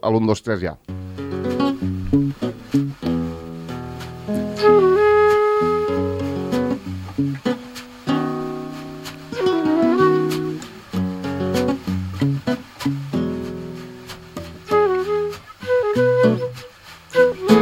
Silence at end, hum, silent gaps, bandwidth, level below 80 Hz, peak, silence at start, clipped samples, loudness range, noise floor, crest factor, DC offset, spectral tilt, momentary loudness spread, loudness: 0 s; none; none; 16 kHz; -48 dBFS; 0 dBFS; 0.05 s; under 0.1%; 6 LU; -42 dBFS; 20 dB; under 0.1%; -7 dB/octave; 17 LU; -20 LUFS